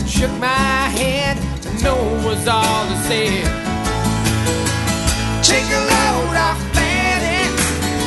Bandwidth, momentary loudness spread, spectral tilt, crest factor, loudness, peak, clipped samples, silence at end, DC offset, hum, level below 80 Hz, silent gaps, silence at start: 12.5 kHz; 5 LU; -3.5 dB/octave; 16 dB; -17 LUFS; 0 dBFS; under 0.1%; 0 s; under 0.1%; none; -26 dBFS; none; 0 s